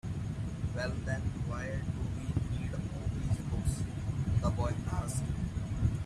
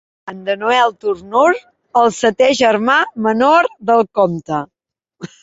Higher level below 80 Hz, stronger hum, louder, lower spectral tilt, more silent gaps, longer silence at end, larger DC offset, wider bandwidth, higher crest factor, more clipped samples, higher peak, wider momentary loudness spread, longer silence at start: first, -42 dBFS vs -58 dBFS; neither; second, -35 LUFS vs -15 LUFS; first, -6.5 dB/octave vs -4.5 dB/octave; neither; second, 0 s vs 0.15 s; neither; first, 13 kHz vs 8 kHz; about the same, 16 dB vs 14 dB; neither; second, -18 dBFS vs -2 dBFS; second, 5 LU vs 12 LU; second, 0.05 s vs 0.25 s